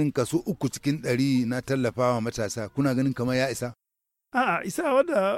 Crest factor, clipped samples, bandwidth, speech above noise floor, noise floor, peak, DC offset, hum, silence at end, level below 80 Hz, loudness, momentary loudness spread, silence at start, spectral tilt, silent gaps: 14 dB; under 0.1%; 16 kHz; 58 dB; -84 dBFS; -10 dBFS; under 0.1%; none; 0 s; -58 dBFS; -26 LUFS; 6 LU; 0 s; -6 dB/octave; none